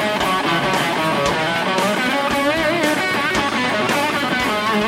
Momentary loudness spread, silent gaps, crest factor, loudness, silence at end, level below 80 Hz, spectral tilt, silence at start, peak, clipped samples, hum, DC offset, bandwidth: 1 LU; none; 14 dB; -18 LUFS; 0 s; -46 dBFS; -3.5 dB/octave; 0 s; -4 dBFS; under 0.1%; none; under 0.1%; 16.5 kHz